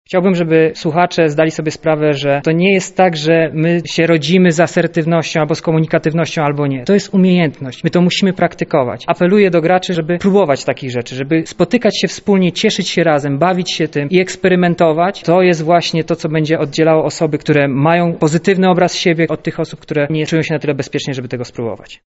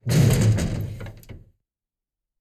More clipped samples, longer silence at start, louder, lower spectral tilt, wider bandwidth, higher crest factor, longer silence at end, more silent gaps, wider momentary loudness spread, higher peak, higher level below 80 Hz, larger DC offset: neither; about the same, 0.1 s vs 0.05 s; first, -14 LUFS vs -21 LUFS; about the same, -6 dB/octave vs -6 dB/octave; second, 8.2 kHz vs 15 kHz; about the same, 14 dB vs 18 dB; second, 0.1 s vs 1 s; neither; second, 7 LU vs 20 LU; first, 0 dBFS vs -6 dBFS; second, -50 dBFS vs -38 dBFS; neither